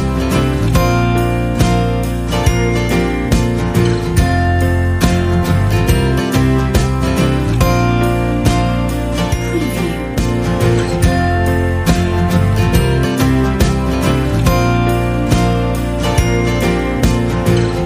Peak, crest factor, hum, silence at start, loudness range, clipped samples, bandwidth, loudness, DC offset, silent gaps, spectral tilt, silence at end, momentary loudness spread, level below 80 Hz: 0 dBFS; 14 dB; none; 0 s; 2 LU; under 0.1%; 15.5 kHz; -14 LUFS; under 0.1%; none; -6.5 dB/octave; 0 s; 3 LU; -20 dBFS